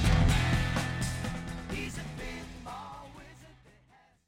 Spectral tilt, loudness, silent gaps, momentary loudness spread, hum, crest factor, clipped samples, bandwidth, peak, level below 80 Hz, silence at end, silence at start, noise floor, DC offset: -5 dB/octave; -33 LUFS; none; 21 LU; none; 18 dB; under 0.1%; 16.5 kHz; -12 dBFS; -38 dBFS; 0.75 s; 0 s; -63 dBFS; under 0.1%